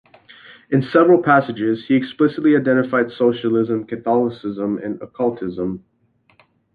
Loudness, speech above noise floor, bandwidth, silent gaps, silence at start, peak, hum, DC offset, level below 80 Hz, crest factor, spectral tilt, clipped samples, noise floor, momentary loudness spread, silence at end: -18 LUFS; 43 dB; 4.9 kHz; none; 0.5 s; -2 dBFS; none; under 0.1%; -58 dBFS; 16 dB; -9.5 dB/octave; under 0.1%; -60 dBFS; 11 LU; 0.95 s